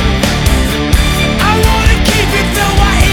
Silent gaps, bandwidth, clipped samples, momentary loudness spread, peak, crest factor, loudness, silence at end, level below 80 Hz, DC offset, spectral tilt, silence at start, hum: none; 19.5 kHz; 0.7%; 2 LU; 0 dBFS; 10 dB; -11 LUFS; 0 s; -14 dBFS; under 0.1%; -4.5 dB/octave; 0 s; none